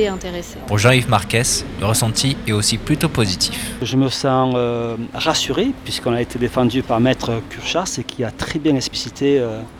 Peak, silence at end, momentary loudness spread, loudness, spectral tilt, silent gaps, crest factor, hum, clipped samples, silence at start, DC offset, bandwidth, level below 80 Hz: 0 dBFS; 0 s; 8 LU; -18 LUFS; -4.5 dB/octave; none; 18 dB; none; under 0.1%; 0 s; under 0.1%; 17 kHz; -38 dBFS